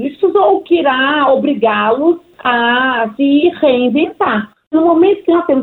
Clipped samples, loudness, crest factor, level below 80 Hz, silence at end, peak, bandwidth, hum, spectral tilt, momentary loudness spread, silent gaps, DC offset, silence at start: under 0.1%; -12 LUFS; 10 dB; -56 dBFS; 0 s; -2 dBFS; 4.2 kHz; none; -7.5 dB/octave; 5 LU; 4.67-4.71 s; under 0.1%; 0 s